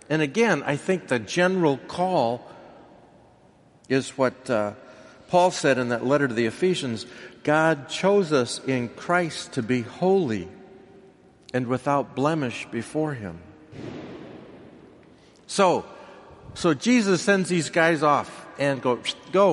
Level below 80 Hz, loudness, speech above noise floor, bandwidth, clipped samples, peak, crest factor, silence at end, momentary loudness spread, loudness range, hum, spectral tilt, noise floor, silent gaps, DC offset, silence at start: -64 dBFS; -24 LUFS; 33 dB; 11.5 kHz; under 0.1%; -6 dBFS; 20 dB; 0 s; 17 LU; 6 LU; none; -5 dB/octave; -56 dBFS; none; under 0.1%; 0.1 s